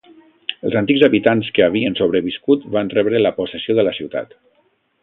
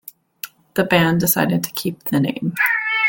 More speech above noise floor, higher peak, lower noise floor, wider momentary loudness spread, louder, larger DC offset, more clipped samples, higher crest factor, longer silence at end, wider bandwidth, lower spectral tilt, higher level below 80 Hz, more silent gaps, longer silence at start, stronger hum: first, 45 dB vs 20 dB; about the same, 0 dBFS vs -2 dBFS; first, -61 dBFS vs -38 dBFS; about the same, 13 LU vs 14 LU; about the same, -17 LUFS vs -18 LUFS; neither; neither; about the same, 18 dB vs 18 dB; first, 0.8 s vs 0 s; second, 4.2 kHz vs 17 kHz; first, -9 dB/octave vs -4.5 dB/octave; about the same, -54 dBFS vs -54 dBFS; neither; about the same, 0.5 s vs 0.45 s; neither